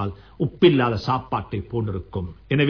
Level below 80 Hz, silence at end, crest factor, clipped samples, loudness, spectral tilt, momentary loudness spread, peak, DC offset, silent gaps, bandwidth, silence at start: -46 dBFS; 0 s; 18 dB; under 0.1%; -23 LUFS; -8.5 dB/octave; 14 LU; -4 dBFS; 0.1%; none; 5.4 kHz; 0 s